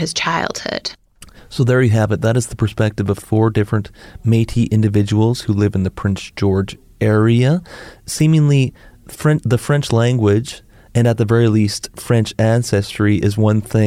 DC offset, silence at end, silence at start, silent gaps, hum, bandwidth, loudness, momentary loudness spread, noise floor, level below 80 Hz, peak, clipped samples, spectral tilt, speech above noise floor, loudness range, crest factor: under 0.1%; 0 s; 0 s; none; none; 14.5 kHz; -16 LUFS; 9 LU; -42 dBFS; -42 dBFS; -4 dBFS; under 0.1%; -6.5 dB/octave; 27 dB; 1 LU; 12 dB